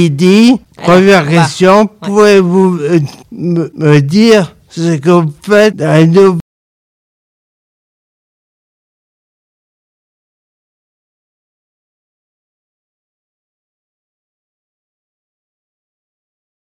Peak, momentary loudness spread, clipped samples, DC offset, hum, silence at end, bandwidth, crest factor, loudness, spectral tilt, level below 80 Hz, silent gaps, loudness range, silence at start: 0 dBFS; 9 LU; 2%; under 0.1%; none; 10.35 s; 14.5 kHz; 12 dB; -8 LUFS; -6.5 dB/octave; -52 dBFS; none; 5 LU; 0 s